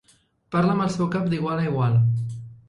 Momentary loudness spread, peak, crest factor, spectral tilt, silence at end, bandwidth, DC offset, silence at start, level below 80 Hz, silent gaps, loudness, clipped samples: 7 LU; -10 dBFS; 14 dB; -8 dB/octave; 0.15 s; 11 kHz; under 0.1%; 0.5 s; -54 dBFS; none; -23 LUFS; under 0.1%